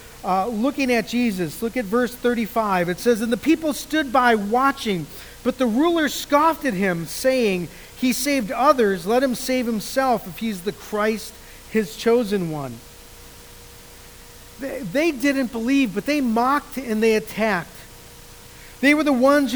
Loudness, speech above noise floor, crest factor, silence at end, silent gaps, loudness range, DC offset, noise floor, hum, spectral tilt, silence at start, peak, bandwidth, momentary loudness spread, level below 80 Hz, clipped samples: -21 LUFS; 22 dB; 20 dB; 0 s; none; 6 LU; 0.1%; -43 dBFS; none; -4.5 dB/octave; 0 s; -2 dBFS; over 20 kHz; 11 LU; -48 dBFS; under 0.1%